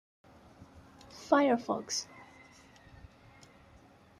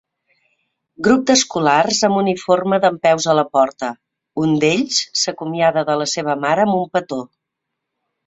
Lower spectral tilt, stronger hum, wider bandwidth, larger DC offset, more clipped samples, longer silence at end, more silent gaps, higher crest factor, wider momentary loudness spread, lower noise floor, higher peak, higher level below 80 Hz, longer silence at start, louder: about the same, -3.5 dB/octave vs -3.5 dB/octave; neither; first, 13 kHz vs 8.4 kHz; neither; neither; first, 1.95 s vs 1 s; neither; first, 24 dB vs 16 dB; first, 29 LU vs 7 LU; second, -59 dBFS vs -79 dBFS; second, -12 dBFS vs -2 dBFS; second, -68 dBFS vs -58 dBFS; first, 1.15 s vs 1 s; second, -30 LUFS vs -17 LUFS